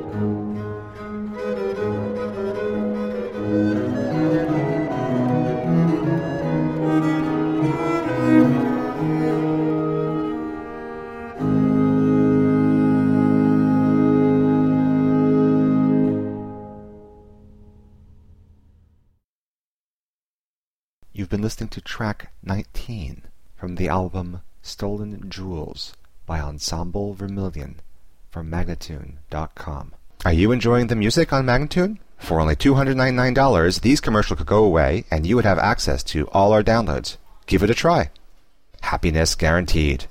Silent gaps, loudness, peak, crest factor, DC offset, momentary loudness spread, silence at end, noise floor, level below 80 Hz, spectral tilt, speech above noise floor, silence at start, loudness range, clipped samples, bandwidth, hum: 19.24-21.02 s; -20 LUFS; -4 dBFS; 16 dB; under 0.1%; 16 LU; 0 s; under -90 dBFS; -34 dBFS; -6.5 dB/octave; over 70 dB; 0 s; 12 LU; under 0.1%; 15.5 kHz; none